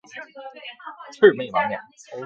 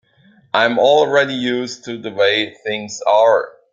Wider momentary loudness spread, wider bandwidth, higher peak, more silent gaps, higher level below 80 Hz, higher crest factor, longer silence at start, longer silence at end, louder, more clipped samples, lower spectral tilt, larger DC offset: first, 22 LU vs 12 LU; about the same, 7.4 kHz vs 7.6 kHz; about the same, -2 dBFS vs -2 dBFS; neither; second, -70 dBFS vs -64 dBFS; first, 22 dB vs 16 dB; second, 0.15 s vs 0.55 s; second, 0 s vs 0.25 s; second, -19 LUFS vs -16 LUFS; neither; first, -5.5 dB/octave vs -3.5 dB/octave; neither